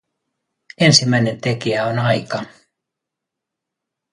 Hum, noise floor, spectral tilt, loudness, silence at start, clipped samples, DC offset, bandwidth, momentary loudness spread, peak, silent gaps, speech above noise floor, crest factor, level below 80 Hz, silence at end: none; -82 dBFS; -4 dB/octave; -17 LUFS; 0.8 s; under 0.1%; under 0.1%; 11.5 kHz; 15 LU; 0 dBFS; none; 66 dB; 20 dB; -58 dBFS; 1.65 s